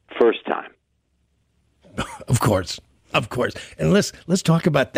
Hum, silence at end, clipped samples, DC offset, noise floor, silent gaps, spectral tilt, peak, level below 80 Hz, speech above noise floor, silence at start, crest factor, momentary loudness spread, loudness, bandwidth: none; 0 s; under 0.1%; under 0.1%; -68 dBFS; none; -5.5 dB/octave; -4 dBFS; -48 dBFS; 47 dB; 0.1 s; 18 dB; 13 LU; -22 LUFS; 16 kHz